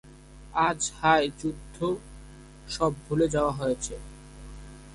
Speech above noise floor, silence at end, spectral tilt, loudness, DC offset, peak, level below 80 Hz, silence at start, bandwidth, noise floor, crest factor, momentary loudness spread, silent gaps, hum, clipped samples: 21 dB; 0 s; -4.5 dB/octave; -27 LUFS; under 0.1%; -8 dBFS; -46 dBFS; 0.05 s; 11.5 kHz; -48 dBFS; 22 dB; 24 LU; none; none; under 0.1%